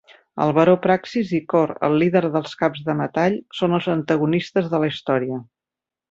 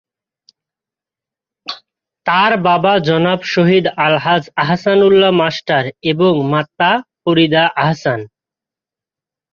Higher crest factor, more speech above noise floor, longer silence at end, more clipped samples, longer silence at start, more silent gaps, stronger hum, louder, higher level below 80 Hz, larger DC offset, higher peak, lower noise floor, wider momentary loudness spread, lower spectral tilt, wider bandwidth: about the same, 18 dB vs 14 dB; second, 69 dB vs 75 dB; second, 0.7 s vs 1.25 s; neither; second, 0.35 s vs 1.65 s; neither; neither; second, -20 LUFS vs -13 LUFS; about the same, -60 dBFS vs -56 dBFS; neither; second, -4 dBFS vs 0 dBFS; about the same, -88 dBFS vs -88 dBFS; second, 7 LU vs 10 LU; about the same, -7.5 dB/octave vs -6.5 dB/octave; about the same, 7.6 kHz vs 7 kHz